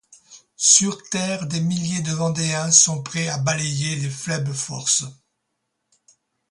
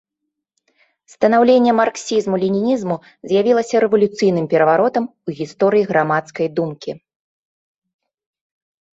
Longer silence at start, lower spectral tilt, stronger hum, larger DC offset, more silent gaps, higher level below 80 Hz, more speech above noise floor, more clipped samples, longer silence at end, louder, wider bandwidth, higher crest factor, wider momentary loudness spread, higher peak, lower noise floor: second, 0.3 s vs 1.2 s; second, -3 dB/octave vs -6 dB/octave; neither; neither; neither; about the same, -60 dBFS vs -64 dBFS; second, 55 dB vs 62 dB; neither; second, 1.35 s vs 2 s; about the same, -19 LUFS vs -17 LUFS; first, 11.5 kHz vs 8 kHz; first, 22 dB vs 16 dB; about the same, 12 LU vs 13 LU; about the same, 0 dBFS vs -2 dBFS; about the same, -76 dBFS vs -79 dBFS